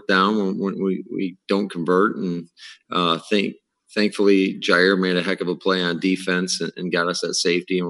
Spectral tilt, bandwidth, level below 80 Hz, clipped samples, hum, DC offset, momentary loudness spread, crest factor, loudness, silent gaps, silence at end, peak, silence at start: -4.5 dB/octave; 12 kHz; -76 dBFS; under 0.1%; none; under 0.1%; 10 LU; 18 dB; -21 LUFS; none; 0 s; -2 dBFS; 0.1 s